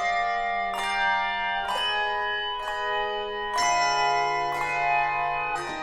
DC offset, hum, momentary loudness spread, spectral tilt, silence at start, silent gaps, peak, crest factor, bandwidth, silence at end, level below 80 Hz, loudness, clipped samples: under 0.1%; none; 6 LU; -1 dB/octave; 0 s; none; -12 dBFS; 14 dB; 15.5 kHz; 0 s; -50 dBFS; -25 LUFS; under 0.1%